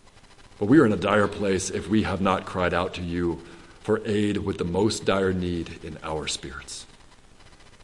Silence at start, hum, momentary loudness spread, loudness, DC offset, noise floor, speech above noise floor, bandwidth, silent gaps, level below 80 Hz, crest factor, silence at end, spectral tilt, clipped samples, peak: 0.4 s; none; 16 LU; -25 LUFS; under 0.1%; -51 dBFS; 26 dB; 11.5 kHz; none; -52 dBFS; 20 dB; 0.35 s; -5.5 dB/octave; under 0.1%; -4 dBFS